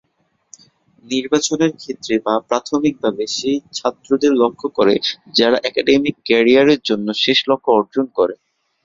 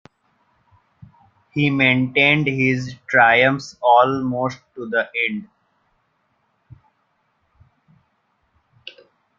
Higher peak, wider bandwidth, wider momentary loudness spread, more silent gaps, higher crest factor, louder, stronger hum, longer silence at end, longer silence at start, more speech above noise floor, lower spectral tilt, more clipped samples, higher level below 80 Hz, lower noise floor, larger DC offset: about the same, 0 dBFS vs -2 dBFS; about the same, 7.8 kHz vs 7.6 kHz; second, 7 LU vs 17 LU; neither; about the same, 16 dB vs 20 dB; about the same, -17 LUFS vs -17 LUFS; neither; about the same, 0.5 s vs 0.5 s; second, 1.1 s vs 1.55 s; about the same, 49 dB vs 49 dB; second, -3.5 dB/octave vs -6 dB/octave; neither; about the same, -58 dBFS vs -60 dBFS; about the same, -66 dBFS vs -67 dBFS; neither